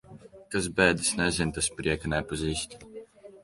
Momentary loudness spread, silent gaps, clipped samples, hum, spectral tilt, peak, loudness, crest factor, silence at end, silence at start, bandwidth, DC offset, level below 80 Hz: 17 LU; none; under 0.1%; none; -3.5 dB/octave; -8 dBFS; -27 LUFS; 22 dB; 0.05 s; 0.1 s; 11.5 kHz; under 0.1%; -46 dBFS